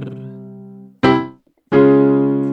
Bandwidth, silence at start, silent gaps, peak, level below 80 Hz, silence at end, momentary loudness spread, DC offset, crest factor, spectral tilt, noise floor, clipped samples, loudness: 6 kHz; 0 s; none; 0 dBFS; -50 dBFS; 0 s; 22 LU; under 0.1%; 16 dB; -8.5 dB/octave; -38 dBFS; under 0.1%; -14 LUFS